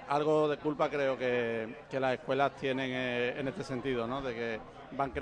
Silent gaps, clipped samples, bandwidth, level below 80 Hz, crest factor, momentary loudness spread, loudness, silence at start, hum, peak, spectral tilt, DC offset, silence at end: none; under 0.1%; 10 kHz; -60 dBFS; 18 dB; 8 LU; -33 LUFS; 0 s; none; -16 dBFS; -6 dB/octave; under 0.1%; 0 s